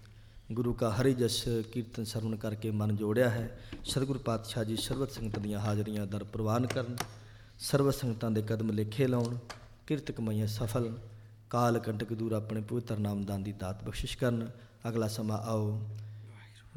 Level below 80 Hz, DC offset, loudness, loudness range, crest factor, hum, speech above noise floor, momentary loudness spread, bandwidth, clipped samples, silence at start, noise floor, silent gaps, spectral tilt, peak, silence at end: -52 dBFS; under 0.1%; -34 LUFS; 3 LU; 18 dB; none; 20 dB; 12 LU; 17.5 kHz; under 0.1%; 0 s; -53 dBFS; none; -6 dB/octave; -16 dBFS; 0.05 s